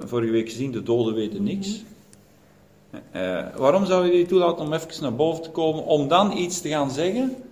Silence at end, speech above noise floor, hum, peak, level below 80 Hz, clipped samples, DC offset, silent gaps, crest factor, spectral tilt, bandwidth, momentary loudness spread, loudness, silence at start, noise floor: 0.05 s; 32 dB; none; -2 dBFS; -58 dBFS; under 0.1%; under 0.1%; none; 20 dB; -5.5 dB/octave; 16 kHz; 10 LU; -23 LUFS; 0 s; -54 dBFS